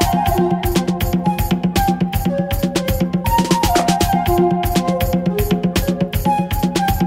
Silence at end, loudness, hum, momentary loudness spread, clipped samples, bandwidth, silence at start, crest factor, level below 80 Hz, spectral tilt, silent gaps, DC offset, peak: 0 s; -17 LUFS; none; 4 LU; under 0.1%; 16.5 kHz; 0 s; 14 dB; -26 dBFS; -5.5 dB/octave; none; under 0.1%; -2 dBFS